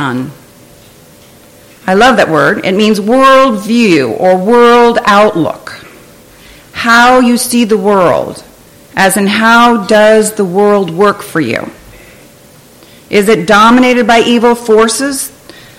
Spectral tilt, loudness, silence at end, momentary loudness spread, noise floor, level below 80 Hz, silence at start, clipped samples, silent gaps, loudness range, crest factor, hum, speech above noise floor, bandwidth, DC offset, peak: -4 dB/octave; -8 LUFS; 0.5 s; 12 LU; -38 dBFS; -44 dBFS; 0 s; 0.2%; none; 4 LU; 8 dB; none; 31 dB; 16.5 kHz; under 0.1%; 0 dBFS